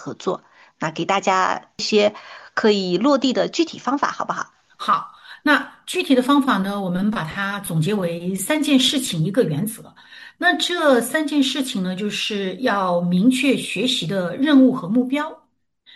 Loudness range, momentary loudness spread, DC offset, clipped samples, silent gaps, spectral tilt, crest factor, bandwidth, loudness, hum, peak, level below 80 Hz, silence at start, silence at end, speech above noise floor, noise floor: 2 LU; 10 LU; under 0.1%; under 0.1%; none; -4.5 dB/octave; 16 dB; 12.5 kHz; -20 LUFS; none; -4 dBFS; -62 dBFS; 0 s; 0.6 s; 37 dB; -57 dBFS